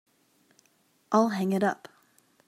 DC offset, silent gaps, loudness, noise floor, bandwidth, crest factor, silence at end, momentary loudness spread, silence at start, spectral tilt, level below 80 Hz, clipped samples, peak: under 0.1%; none; -27 LUFS; -68 dBFS; 14.5 kHz; 22 dB; 0.75 s; 6 LU; 1.1 s; -6.5 dB/octave; -78 dBFS; under 0.1%; -10 dBFS